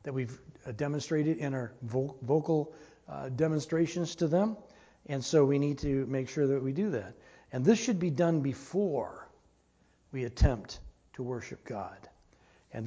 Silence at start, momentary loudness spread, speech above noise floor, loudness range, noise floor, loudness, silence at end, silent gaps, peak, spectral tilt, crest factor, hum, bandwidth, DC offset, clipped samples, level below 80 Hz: 0.05 s; 16 LU; 37 dB; 6 LU; -68 dBFS; -32 LUFS; 0 s; none; -12 dBFS; -6.5 dB/octave; 20 dB; none; 8 kHz; under 0.1%; under 0.1%; -44 dBFS